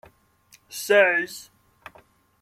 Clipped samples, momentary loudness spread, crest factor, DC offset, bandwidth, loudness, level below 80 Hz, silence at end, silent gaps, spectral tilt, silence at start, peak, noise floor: under 0.1%; 21 LU; 20 dB; under 0.1%; 15.5 kHz; -21 LUFS; -70 dBFS; 1 s; none; -2 dB/octave; 0.7 s; -6 dBFS; -58 dBFS